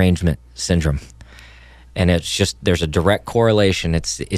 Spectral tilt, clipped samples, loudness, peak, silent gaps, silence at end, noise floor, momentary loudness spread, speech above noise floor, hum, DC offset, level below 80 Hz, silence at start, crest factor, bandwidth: -5 dB/octave; under 0.1%; -18 LUFS; -2 dBFS; none; 0 s; -43 dBFS; 7 LU; 26 dB; none; under 0.1%; -30 dBFS; 0 s; 16 dB; 14.5 kHz